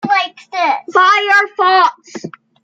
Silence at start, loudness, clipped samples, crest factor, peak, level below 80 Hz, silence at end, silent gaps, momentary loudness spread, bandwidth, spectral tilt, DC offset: 0.05 s; -12 LUFS; under 0.1%; 12 dB; 0 dBFS; -70 dBFS; 0.35 s; none; 20 LU; 9.2 kHz; -3 dB/octave; under 0.1%